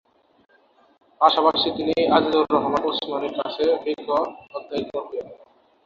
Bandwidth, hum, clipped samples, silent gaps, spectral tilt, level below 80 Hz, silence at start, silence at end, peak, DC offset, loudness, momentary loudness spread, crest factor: 7.2 kHz; none; under 0.1%; none; -6 dB/octave; -60 dBFS; 1.2 s; 0.5 s; -2 dBFS; under 0.1%; -22 LUFS; 12 LU; 22 dB